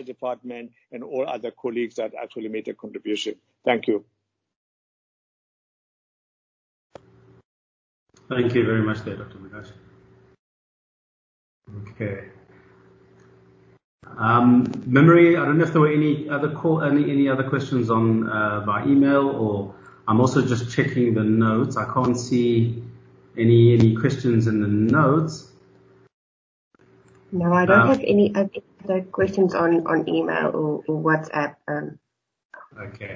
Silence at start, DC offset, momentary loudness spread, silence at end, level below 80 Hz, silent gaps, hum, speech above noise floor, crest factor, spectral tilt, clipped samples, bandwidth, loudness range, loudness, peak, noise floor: 0 s; under 0.1%; 19 LU; 0 s; -56 dBFS; 4.56-6.90 s, 7.45-8.06 s, 10.39-11.61 s, 13.84-13.98 s, 26.14-26.71 s, 32.45-32.49 s; none; 34 dB; 20 dB; -7.5 dB/octave; under 0.1%; 7.6 kHz; 15 LU; -21 LUFS; -2 dBFS; -54 dBFS